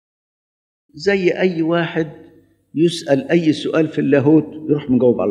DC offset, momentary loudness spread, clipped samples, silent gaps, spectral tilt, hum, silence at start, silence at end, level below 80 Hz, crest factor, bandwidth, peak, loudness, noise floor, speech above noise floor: under 0.1%; 7 LU; under 0.1%; none; -7 dB/octave; none; 0.95 s; 0 s; -58 dBFS; 18 dB; 10.5 kHz; 0 dBFS; -17 LUFS; -49 dBFS; 33 dB